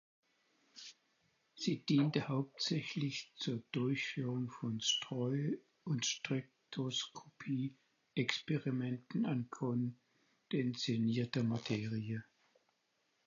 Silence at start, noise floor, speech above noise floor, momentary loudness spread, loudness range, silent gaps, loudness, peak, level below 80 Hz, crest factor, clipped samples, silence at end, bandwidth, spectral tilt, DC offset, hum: 0.75 s; -80 dBFS; 43 dB; 9 LU; 2 LU; none; -38 LUFS; -16 dBFS; -80 dBFS; 22 dB; under 0.1%; 1.05 s; 7.2 kHz; -5 dB/octave; under 0.1%; none